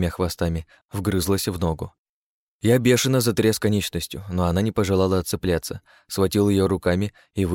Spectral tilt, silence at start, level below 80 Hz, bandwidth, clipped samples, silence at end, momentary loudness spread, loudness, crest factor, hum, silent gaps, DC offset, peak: -5.5 dB/octave; 0 s; -42 dBFS; 17 kHz; under 0.1%; 0 s; 12 LU; -22 LUFS; 16 dB; none; 0.85-0.89 s, 1.98-2.60 s; under 0.1%; -6 dBFS